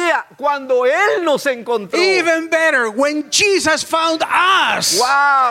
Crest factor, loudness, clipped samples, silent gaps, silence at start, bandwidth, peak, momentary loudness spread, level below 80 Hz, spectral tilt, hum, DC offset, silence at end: 14 dB; -14 LUFS; under 0.1%; none; 0 s; 16.5 kHz; -2 dBFS; 6 LU; -60 dBFS; -1.5 dB/octave; none; under 0.1%; 0 s